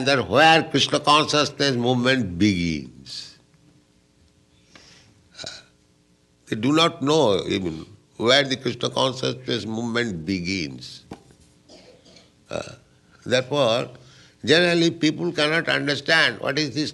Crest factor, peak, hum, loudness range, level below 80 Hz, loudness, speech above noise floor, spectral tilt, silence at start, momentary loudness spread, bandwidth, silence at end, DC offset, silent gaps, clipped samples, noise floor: 22 dB; -2 dBFS; none; 10 LU; -56 dBFS; -21 LUFS; 39 dB; -4 dB/octave; 0 s; 18 LU; 12 kHz; 0 s; under 0.1%; none; under 0.1%; -60 dBFS